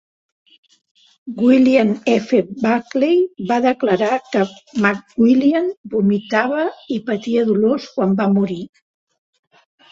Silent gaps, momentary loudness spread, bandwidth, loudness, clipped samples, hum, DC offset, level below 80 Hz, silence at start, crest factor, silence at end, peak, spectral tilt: 5.77-5.84 s; 9 LU; 7.6 kHz; -17 LUFS; under 0.1%; none; under 0.1%; -60 dBFS; 1.25 s; 16 dB; 1.25 s; -2 dBFS; -7 dB/octave